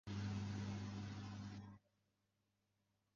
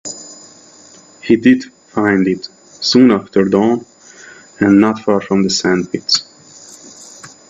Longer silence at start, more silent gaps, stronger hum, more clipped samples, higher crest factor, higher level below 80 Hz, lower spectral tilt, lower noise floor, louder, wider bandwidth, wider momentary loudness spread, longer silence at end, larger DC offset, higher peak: about the same, 0.05 s vs 0.05 s; neither; neither; neither; about the same, 14 dB vs 16 dB; second, -66 dBFS vs -56 dBFS; first, -6.5 dB/octave vs -4.5 dB/octave; first, -86 dBFS vs -42 dBFS; second, -49 LUFS vs -14 LUFS; second, 7.4 kHz vs 8.2 kHz; second, 13 LU vs 24 LU; first, 1.4 s vs 0.2 s; neither; second, -36 dBFS vs 0 dBFS